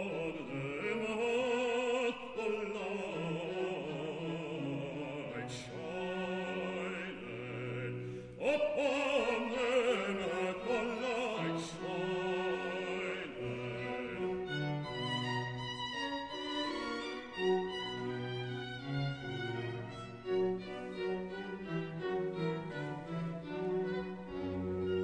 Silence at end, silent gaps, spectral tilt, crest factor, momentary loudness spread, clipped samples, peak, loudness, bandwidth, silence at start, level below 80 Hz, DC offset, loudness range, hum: 0 s; none; -5.5 dB/octave; 18 dB; 9 LU; under 0.1%; -20 dBFS; -37 LUFS; 10 kHz; 0 s; -66 dBFS; under 0.1%; 5 LU; none